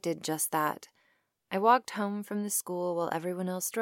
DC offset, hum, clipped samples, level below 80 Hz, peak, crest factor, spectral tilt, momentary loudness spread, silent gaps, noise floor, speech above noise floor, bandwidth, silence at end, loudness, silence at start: under 0.1%; none; under 0.1%; -86 dBFS; -10 dBFS; 22 dB; -4 dB/octave; 9 LU; none; -73 dBFS; 42 dB; 17 kHz; 0 s; -30 LUFS; 0.05 s